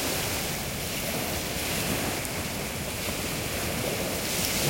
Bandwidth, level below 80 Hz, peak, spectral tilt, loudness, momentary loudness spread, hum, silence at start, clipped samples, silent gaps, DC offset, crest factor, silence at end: 16.5 kHz; -46 dBFS; -12 dBFS; -3 dB/octave; -29 LUFS; 3 LU; none; 0 s; under 0.1%; none; under 0.1%; 18 dB; 0 s